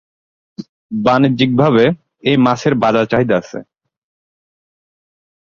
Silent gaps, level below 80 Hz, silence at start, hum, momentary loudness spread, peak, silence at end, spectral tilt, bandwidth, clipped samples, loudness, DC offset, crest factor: 0.69-0.89 s; -50 dBFS; 0.6 s; none; 19 LU; 0 dBFS; 1.8 s; -7 dB/octave; 7.4 kHz; under 0.1%; -14 LUFS; under 0.1%; 16 dB